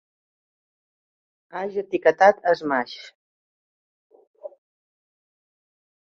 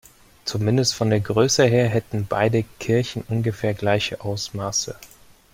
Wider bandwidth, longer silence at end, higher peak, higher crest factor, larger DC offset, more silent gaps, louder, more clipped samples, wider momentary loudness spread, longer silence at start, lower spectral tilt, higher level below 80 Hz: second, 7.2 kHz vs 16 kHz; first, 1.65 s vs 0.45 s; about the same, -4 dBFS vs -4 dBFS; first, 24 dB vs 18 dB; neither; first, 3.15-4.10 s, 4.27-4.34 s vs none; about the same, -21 LUFS vs -22 LUFS; neither; first, 26 LU vs 10 LU; first, 1.55 s vs 0.45 s; about the same, -5 dB/octave vs -5 dB/octave; second, -74 dBFS vs -52 dBFS